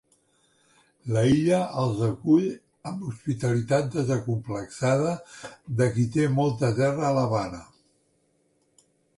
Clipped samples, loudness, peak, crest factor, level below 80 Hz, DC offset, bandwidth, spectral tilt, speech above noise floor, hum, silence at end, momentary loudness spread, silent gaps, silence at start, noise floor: under 0.1%; -25 LUFS; -10 dBFS; 16 dB; -56 dBFS; under 0.1%; 11.5 kHz; -7 dB/octave; 44 dB; none; 1.55 s; 13 LU; none; 1.05 s; -68 dBFS